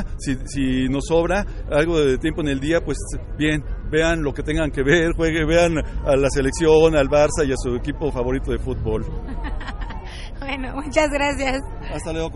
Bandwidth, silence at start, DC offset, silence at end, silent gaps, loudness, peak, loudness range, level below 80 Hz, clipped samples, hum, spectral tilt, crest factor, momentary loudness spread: 11.5 kHz; 0 s; under 0.1%; 0 s; none; -21 LUFS; -2 dBFS; 7 LU; -28 dBFS; under 0.1%; none; -5.5 dB/octave; 18 dB; 13 LU